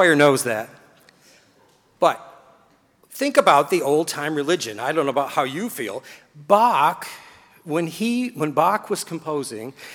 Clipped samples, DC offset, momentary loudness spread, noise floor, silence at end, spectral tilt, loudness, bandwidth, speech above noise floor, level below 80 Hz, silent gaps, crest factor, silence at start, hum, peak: under 0.1%; under 0.1%; 16 LU; -58 dBFS; 0 s; -4 dB/octave; -21 LUFS; over 20 kHz; 37 dB; -72 dBFS; none; 20 dB; 0 s; none; -2 dBFS